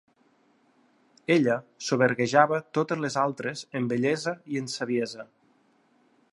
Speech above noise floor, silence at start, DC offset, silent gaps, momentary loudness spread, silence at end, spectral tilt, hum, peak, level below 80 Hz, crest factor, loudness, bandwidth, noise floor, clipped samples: 39 dB; 1.3 s; under 0.1%; none; 11 LU; 1.1 s; -5 dB/octave; none; -6 dBFS; -74 dBFS; 22 dB; -26 LUFS; 11.5 kHz; -65 dBFS; under 0.1%